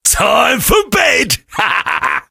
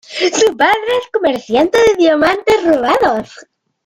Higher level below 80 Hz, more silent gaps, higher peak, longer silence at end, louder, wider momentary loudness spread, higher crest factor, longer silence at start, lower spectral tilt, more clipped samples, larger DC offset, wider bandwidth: first, -30 dBFS vs -46 dBFS; neither; about the same, 0 dBFS vs -2 dBFS; second, 0.1 s vs 0.45 s; about the same, -12 LUFS vs -13 LUFS; about the same, 5 LU vs 6 LU; about the same, 12 dB vs 12 dB; about the same, 0.05 s vs 0.1 s; about the same, -2 dB/octave vs -3 dB/octave; neither; neither; about the same, 17.5 kHz vs 16 kHz